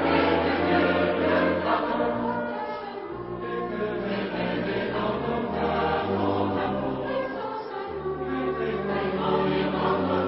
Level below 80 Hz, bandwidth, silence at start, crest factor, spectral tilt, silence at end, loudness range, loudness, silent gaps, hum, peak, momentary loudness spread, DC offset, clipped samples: -48 dBFS; 5.8 kHz; 0 s; 16 dB; -10.5 dB/octave; 0 s; 4 LU; -26 LUFS; none; none; -10 dBFS; 9 LU; under 0.1%; under 0.1%